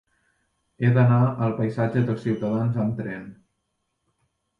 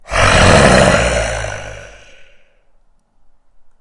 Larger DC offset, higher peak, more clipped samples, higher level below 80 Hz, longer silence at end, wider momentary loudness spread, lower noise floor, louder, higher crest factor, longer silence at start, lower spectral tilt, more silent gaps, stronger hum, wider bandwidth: neither; second, -8 dBFS vs 0 dBFS; neither; second, -60 dBFS vs -26 dBFS; second, 1.25 s vs 1.55 s; second, 11 LU vs 18 LU; first, -76 dBFS vs -50 dBFS; second, -23 LUFS vs -10 LUFS; about the same, 16 dB vs 14 dB; first, 0.8 s vs 0.1 s; first, -10 dB/octave vs -4 dB/octave; neither; neither; second, 4.8 kHz vs 11.5 kHz